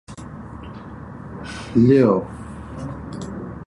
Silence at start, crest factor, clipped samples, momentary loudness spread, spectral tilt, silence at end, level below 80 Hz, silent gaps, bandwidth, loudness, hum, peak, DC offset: 0.1 s; 20 dB; under 0.1%; 22 LU; -8 dB/octave; 0 s; -44 dBFS; none; 11 kHz; -19 LUFS; none; -4 dBFS; under 0.1%